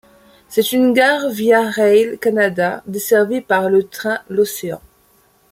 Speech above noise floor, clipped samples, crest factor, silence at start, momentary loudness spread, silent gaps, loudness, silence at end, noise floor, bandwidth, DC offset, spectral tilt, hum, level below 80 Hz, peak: 39 dB; under 0.1%; 16 dB; 0.5 s; 9 LU; none; -16 LUFS; 0.75 s; -55 dBFS; 16.5 kHz; under 0.1%; -4.5 dB/octave; none; -60 dBFS; 0 dBFS